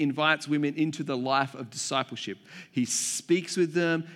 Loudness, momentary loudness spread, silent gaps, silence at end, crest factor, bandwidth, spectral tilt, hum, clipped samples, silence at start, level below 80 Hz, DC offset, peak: -28 LUFS; 10 LU; none; 0 s; 20 dB; 15.5 kHz; -3.5 dB/octave; none; under 0.1%; 0 s; -84 dBFS; under 0.1%; -8 dBFS